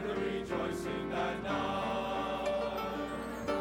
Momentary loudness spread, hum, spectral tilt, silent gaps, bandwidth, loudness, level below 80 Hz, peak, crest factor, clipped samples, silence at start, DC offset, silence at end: 3 LU; none; -5.5 dB/octave; none; 17 kHz; -35 LUFS; -54 dBFS; -22 dBFS; 14 dB; under 0.1%; 0 s; under 0.1%; 0 s